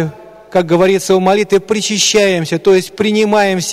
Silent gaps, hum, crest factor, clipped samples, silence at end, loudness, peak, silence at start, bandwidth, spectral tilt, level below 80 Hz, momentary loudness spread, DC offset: none; none; 12 dB; under 0.1%; 0 s; -12 LUFS; -2 dBFS; 0 s; 15.5 kHz; -4 dB/octave; -50 dBFS; 5 LU; under 0.1%